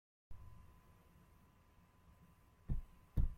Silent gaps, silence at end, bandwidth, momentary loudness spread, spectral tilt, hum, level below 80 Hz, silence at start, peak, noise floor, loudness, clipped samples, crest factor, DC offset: none; 0 s; 3.7 kHz; 21 LU; -8.5 dB/octave; none; -48 dBFS; 0.3 s; -24 dBFS; -69 dBFS; -49 LUFS; under 0.1%; 22 dB; under 0.1%